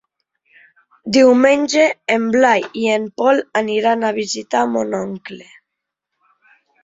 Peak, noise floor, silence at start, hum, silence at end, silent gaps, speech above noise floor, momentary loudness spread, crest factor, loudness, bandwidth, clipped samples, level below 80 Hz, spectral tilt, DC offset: -2 dBFS; -80 dBFS; 1.05 s; none; 1.4 s; none; 64 dB; 13 LU; 16 dB; -16 LUFS; 7.8 kHz; under 0.1%; -62 dBFS; -4 dB/octave; under 0.1%